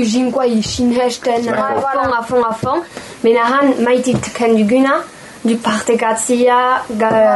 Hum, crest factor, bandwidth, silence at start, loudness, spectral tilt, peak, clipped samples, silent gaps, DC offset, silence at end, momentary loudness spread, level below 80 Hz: none; 12 dB; 12 kHz; 0 s; -14 LUFS; -4.5 dB/octave; -2 dBFS; under 0.1%; none; under 0.1%; 0 s; 7 LU; -48 dBFS